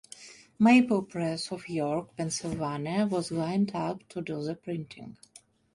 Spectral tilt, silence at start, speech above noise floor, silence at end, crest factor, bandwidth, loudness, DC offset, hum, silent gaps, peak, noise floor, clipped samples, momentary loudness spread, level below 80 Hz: -5.5 dB/octave; 0.2 s; 22 dB; 0.6 s; 18 dB; 11.5 kHz; -29 LUFS; under 0.1%; none; none; -10 dBFS; -51 dBFS; under 0.1%; 22 LU; -64 dBFS